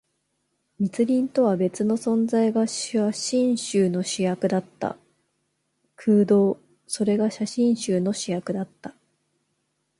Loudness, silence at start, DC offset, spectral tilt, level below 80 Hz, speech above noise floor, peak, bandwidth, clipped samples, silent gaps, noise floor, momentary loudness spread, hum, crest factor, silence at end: -23 LUFS; 0.8 s; under 0.1%; -5.5 dB/octave; -68 dBFS; 51 dB; -10 dBFS; 11.5 kHz; under 0.1%; none; -74 dBFS; 11 LU; none; 14 dB; 1.1 s